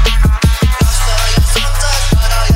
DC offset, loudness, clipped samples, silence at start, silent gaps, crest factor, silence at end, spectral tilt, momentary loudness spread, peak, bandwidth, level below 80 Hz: under 0.1%; -13 LUFS; under 0.1%; 0 s; none; 10 dB; 0 s; -4 dB/octave; 2 LU; 0 dBFS; 16.5 kHz; -12 dBFS